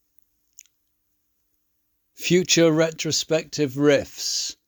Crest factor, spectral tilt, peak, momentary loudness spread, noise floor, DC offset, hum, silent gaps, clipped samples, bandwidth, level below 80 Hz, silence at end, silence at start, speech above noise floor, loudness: 20 dB; -3.5 dB/octave; -6 dBFS; 8 LU; -72 dBFS; under 0.1%; none; none; under 0.1%; over 20 kHz; -62 dBFS; 0.15 s; 2.2 s; 50 dB; -21 LUFS